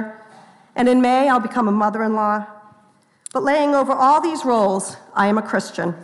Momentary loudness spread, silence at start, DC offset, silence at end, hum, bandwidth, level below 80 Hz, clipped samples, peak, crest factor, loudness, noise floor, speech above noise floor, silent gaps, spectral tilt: 11 LU; 0 s; under 0.1%; 0 s; none; 12 kHz; -64 dBFS; under 0.1%; -6 dBFS; 14 dB; -18 LUFS; -56 dBFS; 38 dB; none; -5.5 dB/octave